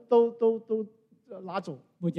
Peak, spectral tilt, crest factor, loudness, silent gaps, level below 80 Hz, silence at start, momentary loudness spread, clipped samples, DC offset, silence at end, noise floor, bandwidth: -12 dBFS; -9 dB/octave; 18 dB; -29 LUFS; none; -84 dBFS; 0.1 s; 20 LU; under 0.1%; under 0.1%; 0 s; -50 dBFS; 5.8 kHz